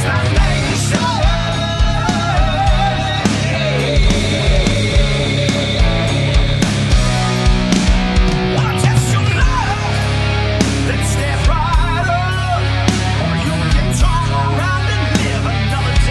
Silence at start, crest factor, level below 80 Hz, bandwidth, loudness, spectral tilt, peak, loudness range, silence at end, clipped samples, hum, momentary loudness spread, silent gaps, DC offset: 0 s; 14 dB; -18 dBFS; 12 kHz; -15 LUFS; -5 dB/octave; 0 dBFS; 1 LU; 0 s; under 0.1%; none; 2 LU; none; under 0.1%